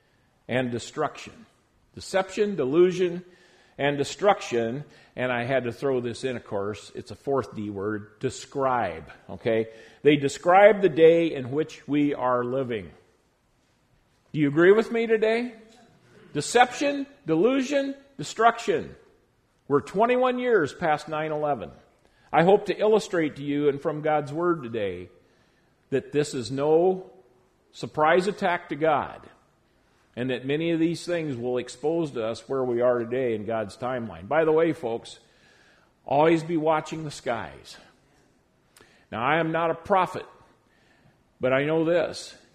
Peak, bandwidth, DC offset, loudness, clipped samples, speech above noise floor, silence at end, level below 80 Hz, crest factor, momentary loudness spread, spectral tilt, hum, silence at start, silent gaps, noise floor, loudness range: -2 dBFS; 12.5 kHz; under 0.1%; -25 LUFS; under 0.1%; 42 dB; 0.2 s; -62 dBFS; 22 dB; 13 LU; -5.5 dB/octave; none; 0.5 s; none; -66 dBFS; 7 LU